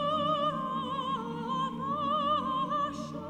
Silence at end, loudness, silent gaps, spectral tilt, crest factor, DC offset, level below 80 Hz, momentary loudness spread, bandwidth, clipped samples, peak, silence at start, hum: 0 s; -31 LUFS; none; -6 dB/octave; 14 dB; under 0.1%; -64 dBFS; 6 LU; 9.8 kHz; under 0.1%; -18 dBFS; 0 s; none